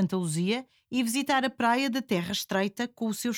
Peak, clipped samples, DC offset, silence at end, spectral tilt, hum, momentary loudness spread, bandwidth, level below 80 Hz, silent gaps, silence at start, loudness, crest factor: -12 dBFS; under 0.1%; under 0.1%; 0 s; -4.5 dB/octave; none; 6 LU; 19.5 kHz; -68 dBFS; none; 0 s; -28 LUFS; 16 dB